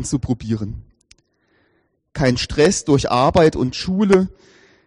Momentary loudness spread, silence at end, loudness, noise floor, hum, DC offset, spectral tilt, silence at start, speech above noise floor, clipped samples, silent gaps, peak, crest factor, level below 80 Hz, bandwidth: 12 LU; 0.55 s; -17 LUFS; -64 dBFS; none; under 0.1%; -5.5 dB/octave; 0 s; 47 dB; under 0.1%; none; -2 dBFS; 16 dB; -40 dBFS; 11 kHz